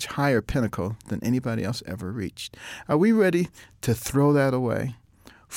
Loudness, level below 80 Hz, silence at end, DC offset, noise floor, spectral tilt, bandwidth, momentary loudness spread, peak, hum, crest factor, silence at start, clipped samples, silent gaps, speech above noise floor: -25 LUFS; -48 dBFS; 0 s; under 0.1%; -53 dBFS; -6.5 dB/octave; 17 kHz; 13 LU; -10 dBFS; none; 14 dB; 0 s; under 0.1%; none; 29 dB